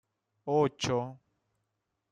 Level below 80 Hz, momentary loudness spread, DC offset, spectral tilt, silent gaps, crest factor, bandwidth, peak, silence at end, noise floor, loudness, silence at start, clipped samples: -66 dBFS; 15 LU; under 0.1%; -5.5 dB/octave; none; 20 dB; 10 kHz; -14 dBFS; 0.95 s; -83 dBFS; -30 LUFS; 0.45 s; under 0.1%